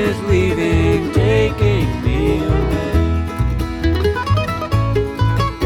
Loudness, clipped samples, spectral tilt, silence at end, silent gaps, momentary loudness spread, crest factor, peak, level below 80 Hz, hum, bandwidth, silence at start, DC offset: -17 LUFS; under 0.1%; -7 dB/octave; 0 s; none; 4 LU; 12 dB; -4 dBFS; -24 dBFS; none; 15 kHz; 0 s; under 0.1%